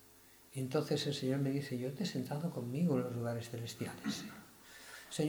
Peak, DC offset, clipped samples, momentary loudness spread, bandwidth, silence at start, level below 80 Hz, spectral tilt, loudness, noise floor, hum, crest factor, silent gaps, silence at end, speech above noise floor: -22 dBFS; under 0.1%; under 0.1%; 16 LU; over 20 kHz; 0 s; -74 dBFS; -6 dB/octave; -38 LUFS; -62 dBFS; none; 18 dB; none; 0 s; 24 dB